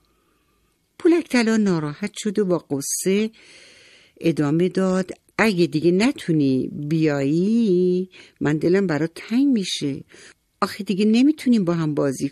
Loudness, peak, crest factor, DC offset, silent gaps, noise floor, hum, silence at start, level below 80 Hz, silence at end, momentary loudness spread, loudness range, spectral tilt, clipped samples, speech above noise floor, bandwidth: -21 LUFS; -4 dBFS; 18 dB; under 0.1%; none; -65 dBFS; none; 1 s; -62 dBFS; 0 s; 8 LU; 3 LU; -5.5 dB/octave; under 0.1%; 45 dB; 14 kHz